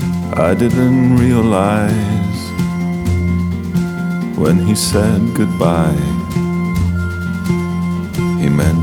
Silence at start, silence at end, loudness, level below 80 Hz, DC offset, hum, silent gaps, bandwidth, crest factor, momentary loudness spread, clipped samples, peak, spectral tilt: 0 s; 0 s; -15 LUFS; -32 dBFS; under 0.1%; none; none; 16 kHz; 14 dB; 7 LU; under 0.1%; 0 dBFS; -6.5 dB/octave